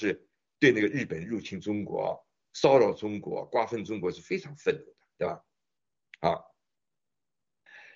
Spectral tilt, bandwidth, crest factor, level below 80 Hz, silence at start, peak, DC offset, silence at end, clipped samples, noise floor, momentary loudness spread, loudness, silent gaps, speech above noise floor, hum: -4.5 dB/octave; 7.6 kHz; 22 dB; -68 dBFS; 0 s; -8 dBFS; under 0.1%; 0.15 s; under 0.1%; under -90 dBFS; 13 LU; -29 LUFS; none; over 62 dB; none